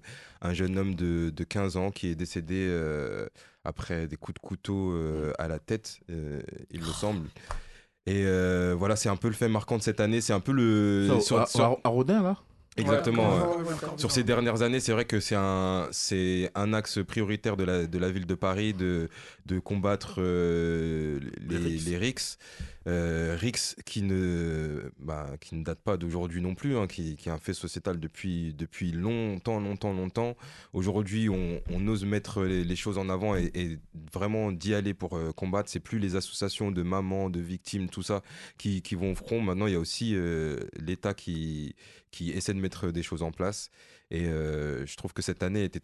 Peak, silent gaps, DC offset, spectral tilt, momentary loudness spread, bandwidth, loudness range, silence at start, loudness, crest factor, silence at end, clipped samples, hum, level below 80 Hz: -10 dBFS; none; under 0.1%; -5.5 dB/octave; 12 LU; 12.5 kHz; 8 LU; 0.05 s; -30 LUFS; 20 dB; 0.05 s; under 0.1%; none; -44 dBFS